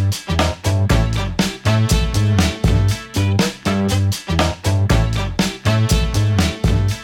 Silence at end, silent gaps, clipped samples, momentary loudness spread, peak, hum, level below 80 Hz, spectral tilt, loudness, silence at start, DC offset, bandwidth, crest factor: 0 s; none; under 0.1%; 3 LU; -4 dBFS; none; -24 dBFS; -5.5 dB/octave; -18 LUFS; 0 s; under 0.1%; 17 kHz; 12 dB